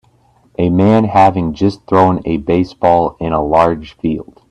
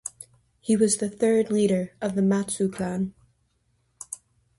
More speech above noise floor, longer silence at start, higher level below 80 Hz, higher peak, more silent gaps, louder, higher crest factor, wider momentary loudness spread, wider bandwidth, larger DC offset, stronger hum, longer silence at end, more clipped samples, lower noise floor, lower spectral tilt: second, 39 dB vs 46 dB; first, 0.6 s vs 0.05 s; first, -38 dBFS vs -62 dBFS; first, 0 dBFS vs -8 dBFS; neither; first, -13 LUFS vs -24 LUFS; about the same, 14 dB vs 18 dB; second, 10 LU vs 17 LU; second, 10 kHz vs 11.5 kHz; neither; neither; second, 0.3 s vs 0.45 s; neither; second, -52 dBFS vs -69 dBFS; first, -8.5 dB/octave vs -5.5 dB/octave